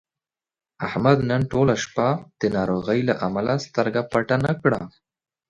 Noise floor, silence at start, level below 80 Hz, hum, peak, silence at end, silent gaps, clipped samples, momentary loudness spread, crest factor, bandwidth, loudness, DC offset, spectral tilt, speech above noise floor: -90 dBFS; 0.8 s; -52 dBFS; none; -2 dBFS; 0.6 s; none; under 0.1%; 6 LU; 20 dB; 10.5 kHz; -22 LUFS; under 0.1%; -6.5 dB/octave; 68 dB